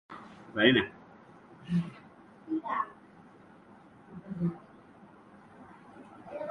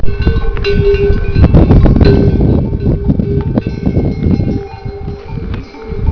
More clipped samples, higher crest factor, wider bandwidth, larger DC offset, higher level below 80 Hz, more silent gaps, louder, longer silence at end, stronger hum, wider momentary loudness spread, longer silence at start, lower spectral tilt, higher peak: second, under 0.1% vs 0.9%; first, 28 dB vs 10 dB; first, 6.4 kHz vs 5.4 kHz; neither; second, -66 dBFS vs -16 dBFS; neither; second, -31 LUFS vs -12 LUFS; about the same, 0 s vs 0 s; neither; first, 29 LU vs 16 LU; about the same, 0.1 s vs 0 s; second, -7.5 dB/octave vs -10 dB/octave; second, -8 dBFS vs 0 dBFS